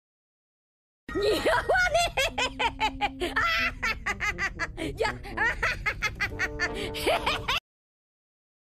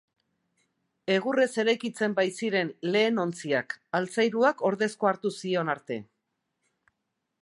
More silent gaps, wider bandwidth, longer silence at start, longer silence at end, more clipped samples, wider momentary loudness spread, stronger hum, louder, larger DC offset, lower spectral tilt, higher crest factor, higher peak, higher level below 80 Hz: neither; first, 15 kHz vs 11.5 kHz; about the same, 1.1 s vs 1.05 s; second, 1.05 s vs 1.4 s; neither; about the same, 6 LU vs 7 LU; neither; about the same, -27 LUFS vs -27 LUFS; neither; second, -3 dB/octave vs -5 dB/octave; about the same, 18 dB vs 20 dB; about the same, -10 dBFS vs -10 dBFS; first, -44 dBFS vs -80 dBFS